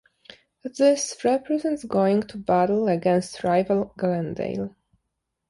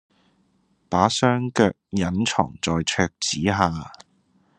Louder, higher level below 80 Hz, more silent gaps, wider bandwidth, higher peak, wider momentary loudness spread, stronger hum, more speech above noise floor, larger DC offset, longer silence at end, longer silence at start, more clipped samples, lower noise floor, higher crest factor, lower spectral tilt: about the same, -23 LUFS vs -22 LUFS; second, -60 dBFS vs -54 dBFS; neither; about the same, 11.5 kHz vs 10.5 kHz; second, -8 dBFS vs -2 dBFS; first, 9 LU vs 6 LU; neither; first, 57 dB vs 43 dB; neither; first, 0.8 s vs 0.65 s; second, 0.65 s vs 0.9 s; neither; first, -79 dBFS vs -65 dBFS; second, 16 dB vs 22 dB; about the same, -5.5 dB/octave vs -4.5 dB/octave